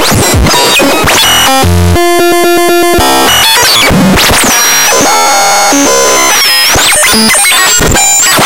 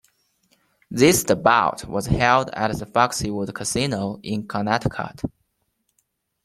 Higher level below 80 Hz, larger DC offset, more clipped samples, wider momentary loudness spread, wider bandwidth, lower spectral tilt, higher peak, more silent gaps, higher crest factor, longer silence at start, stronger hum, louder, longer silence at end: first, -22 dBFS vs -44 dBFS; neither; first, 0.2% vs under 0.1%; second, 3 LU vs 12 LU; about the same, 17.5 kHz vs 16 kHz; second, -2 dB/octave vs -4.5 dB/octave; about the same, 0 dBFS vs -2 dBFS; neither; second, 6 dB vs 20 dB; second, 0 s vs 0.9 s; neither; first, -4 LUFS vs -21 LUFS; second, 0 s vs 1.15 s